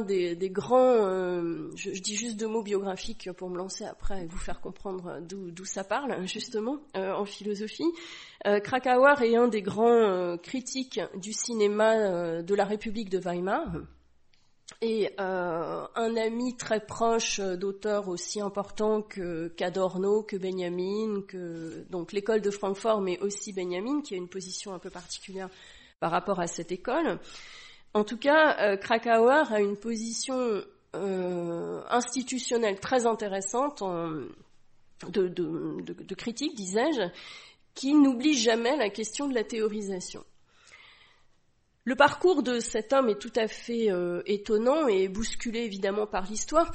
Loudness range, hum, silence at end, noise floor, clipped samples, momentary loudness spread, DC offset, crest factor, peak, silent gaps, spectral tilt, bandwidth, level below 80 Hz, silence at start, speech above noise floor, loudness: 8 LU; none; 0 s; -67 dBFS; under 0.1%; 15 LU; under 0.1%; 22 dB; -8 dBFS; none; -4 dB/octave; 8.8 kHz; -52 dBFS; 0 s; 39 dB; -28 LUFS